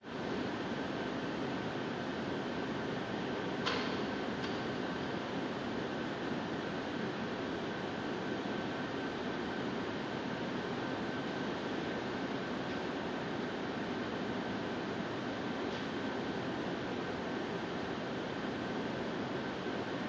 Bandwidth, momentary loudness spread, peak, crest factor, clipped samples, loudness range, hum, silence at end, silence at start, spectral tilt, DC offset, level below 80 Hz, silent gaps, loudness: 8 kHz; 1 LU; -18 dBFS; 20 dB; under 0.1%; 1 LU; none; 0 s; 0 s; -5.5 dB/octave; under 0.1%; -62 dBFS; none; -38 LUFS